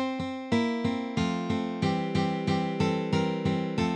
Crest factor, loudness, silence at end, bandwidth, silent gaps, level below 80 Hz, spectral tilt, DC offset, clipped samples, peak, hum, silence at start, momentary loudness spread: 16 dB; -29 LUFS; 0 s; 9.8 kHz; none; -56 dBFS; -6.5 dB/octave; under 0.1%; under 0.1%; -12 dBFS; none; 0 s; 3 LU